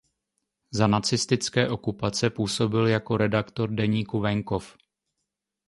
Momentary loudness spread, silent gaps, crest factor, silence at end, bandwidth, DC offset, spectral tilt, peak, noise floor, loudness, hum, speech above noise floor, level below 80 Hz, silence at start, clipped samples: 6 LU; none; 22 dB; 1 s; 11.5 kHz; under 0.1%; -5 dB/octave; -6 dBFS; -83 dBFS; -25 LUFS; none; 58 dB; -54 dBFS; 0.7 s; under 0.1%